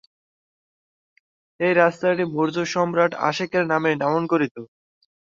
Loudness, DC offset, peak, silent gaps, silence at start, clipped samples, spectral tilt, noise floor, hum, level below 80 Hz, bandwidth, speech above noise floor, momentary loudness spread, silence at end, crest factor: -21 LUFS; under 0.1%; -2 dBFS; 4.51-4.55 s; 1.6 s; under 0.1%; -6 dB/octave; under -90 dBFS; none; -68 dBFS; 7.6 kHz; over 69 dB; 6 LU; 0.55 s; 20 dB